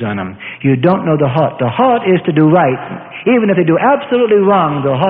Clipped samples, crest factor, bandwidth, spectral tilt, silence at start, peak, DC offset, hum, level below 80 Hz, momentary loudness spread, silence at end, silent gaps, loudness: under 0.1%; 12 dB; 4.4 kHz; -12 dB/octave; 0 s; 0 dBFS; under 0.1%; none; -52 dBFS; 9 LU; 0 s; none; -12 LUFS